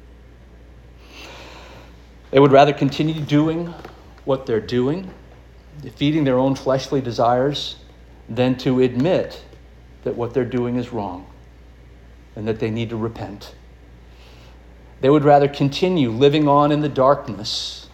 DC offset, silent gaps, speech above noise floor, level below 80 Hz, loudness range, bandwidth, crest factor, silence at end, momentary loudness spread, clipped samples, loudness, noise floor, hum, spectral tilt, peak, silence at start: under 0.1%; none; 26 dB; -46 dBFS; 10 LU; 12.5 kHz; 20 dB; 0.1 s; 23 LU; under 0.1%; -19 LUFS; -44 dBFS; none; -7 dB/octave; -2 dBFS; 1.1 s